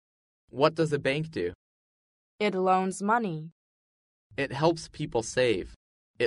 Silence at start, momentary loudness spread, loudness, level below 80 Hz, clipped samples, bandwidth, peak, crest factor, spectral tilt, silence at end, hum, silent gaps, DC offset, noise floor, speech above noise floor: 0.55 s; 13 LU; -28 LUFS; -58 dBFS; under 0.1%; 11.5 kHz; -8 dBFS; 22 dB; -5.5 dB/octave; 0 s; none; 1.55-2.39 s, 3.52-4.30 s, 5.76-6.14 s; under 0.1%; under -90 dBFS; over 63 dB